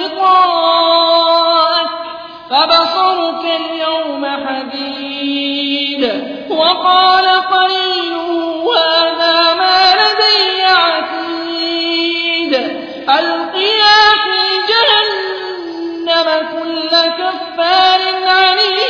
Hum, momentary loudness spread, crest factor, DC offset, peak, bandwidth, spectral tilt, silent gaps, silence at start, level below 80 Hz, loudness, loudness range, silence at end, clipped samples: none; 11 LU; 12 dB; under 0.1%; 0 dBFS; 5.4 kHz; -2.5 dB/octave; none; 0 s; -56 dBFS; -11 LUFS; 4 LU; 0 s; under 0.1%